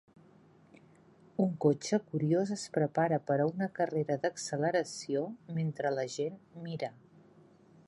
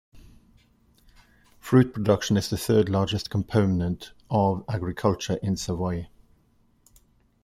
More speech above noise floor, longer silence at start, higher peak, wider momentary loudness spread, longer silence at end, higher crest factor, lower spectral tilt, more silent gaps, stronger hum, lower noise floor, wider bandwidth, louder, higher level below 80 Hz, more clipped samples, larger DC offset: second, 29 dB vs 39 dB; first, 1.4 s vs 0.15 s; second, -14 dBFS vs -6 dBFS; about the same, 9 LU vs 9 LU; second, 0.95 s vs 1.35 s; about the same, 18 dB vs 20 dB; about the same, -6 dB/octave vs -6.5 dB/octave; neither; neither; about the same, -61 dBFS vs -63 dBFS; second, 11.5 kHz vs 15.5 kHz; second, -33 LUFS vs -25 LUFS; second, -78 dBFS vs -52 dBFS; neither; neither